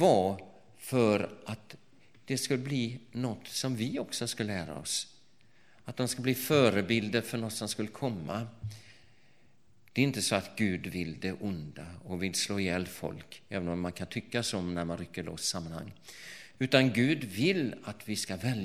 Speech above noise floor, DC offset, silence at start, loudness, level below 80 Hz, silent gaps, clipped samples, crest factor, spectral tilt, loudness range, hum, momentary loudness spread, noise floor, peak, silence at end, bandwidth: 35 dB; 0.1%; 0 s; -32 LUFS; -64 dBFS; none; under 0.1%; 26 dB; -4.5 dB/octave; 4 LU; none; 16 LU; -67 dBFS; -6 dBFS; 0 s; 16.5 kHz